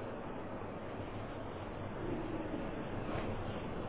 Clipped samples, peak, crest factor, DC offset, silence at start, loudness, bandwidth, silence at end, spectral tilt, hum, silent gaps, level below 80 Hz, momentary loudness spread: under 0.1%; -28 dBFS; 14 dB; 0.2%; 0 s; -42 LUFS; 4 kHz; 0 s; -6 dB/octave; none; none; -52 dBFS; 4 LU